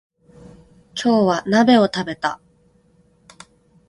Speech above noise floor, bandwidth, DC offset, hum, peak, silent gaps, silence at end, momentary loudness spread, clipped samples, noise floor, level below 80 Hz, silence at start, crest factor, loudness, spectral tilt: 40 dB; 11.5 kHz; under 0.1%; none; -2 dBFS; none; 1.55 s; 14 LU; under 0.1%; -57 dBFS; -58 dBFS; 0.95 s; 20 dB; -18 LUFS; -5.5 dB/octave